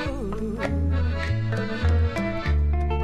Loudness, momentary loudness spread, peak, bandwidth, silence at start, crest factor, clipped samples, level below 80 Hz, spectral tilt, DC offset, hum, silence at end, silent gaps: -25 LUFS; 6 LU; -10 dBFS; 8.8 kHz; 0 s; 12 dB; under 0.1%; -26 dBFS; -7.5 dB/octave; under 0.1%; none; 0 s; none